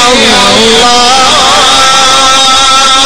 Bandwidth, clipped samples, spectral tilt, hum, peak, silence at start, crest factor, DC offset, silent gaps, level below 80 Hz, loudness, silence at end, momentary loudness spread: over 20 kHz; 5%; -1 dB/octave; none; 0 dBFS; 0 s; 4 dB; 9%; none; -30 dBFS; -2 LUFS; 0 s; 0 LU